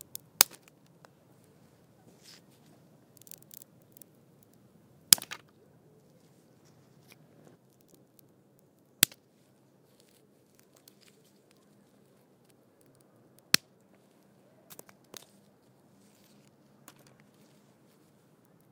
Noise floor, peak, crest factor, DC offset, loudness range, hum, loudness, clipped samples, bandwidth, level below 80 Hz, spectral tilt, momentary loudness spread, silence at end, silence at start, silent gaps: -65 dBFS; 0 dBFS; 38 dB; under 0.1%; 24 LU; none; -25 LUFS; under 0.1%; 18 kHz; -88 dBFS; 0.5 dB/octave; 32 LU; 18.3 s; 0.4 s; none